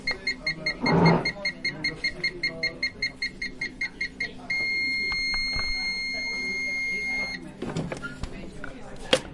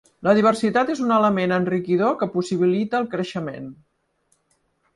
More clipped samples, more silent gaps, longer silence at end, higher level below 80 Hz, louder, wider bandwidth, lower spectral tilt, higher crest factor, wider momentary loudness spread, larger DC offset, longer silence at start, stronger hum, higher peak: neither; neither; second, 0 s vs 1.2 s; first, -46 dBFS vs -64 dBFS; second, -27 LUFS vs -21 LUFS; about the same, 11.5 kHz vs 11.5 kHz; second, -4.5 dB/octave vs -6.5 dB/octave; first, 26 dB vs 18 dB; about the same, 11 LU vs 11 LU; neither; second, 0 s vs 0.2 s; neither; about the same, -4 dBFS vs -4 dBFS